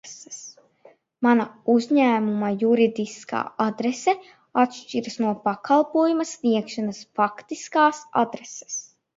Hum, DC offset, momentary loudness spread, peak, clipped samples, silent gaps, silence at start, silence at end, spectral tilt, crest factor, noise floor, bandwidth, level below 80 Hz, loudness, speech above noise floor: none; under 0.1%; 13 LU; -4 dBFS; under 0.1%; none; 0.05 s; 0.35 s; -4.5 dB/octave; 18 dB; -55 dBFS; 7.8 kHz; -74 dBFS; -23 LUFS; 33 dB